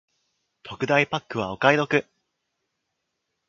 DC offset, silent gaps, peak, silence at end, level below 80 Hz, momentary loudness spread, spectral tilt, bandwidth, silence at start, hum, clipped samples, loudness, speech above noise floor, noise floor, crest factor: under 0.1%; none; -2 dBFS; 1.45 s; -64 dBFS; 11 LU; -5.5 dB/octave; 7.6 kHz; 0.65 s; none; under 0.1%; -23 LUFS; 56 dB; -79 dBFS; 26 dB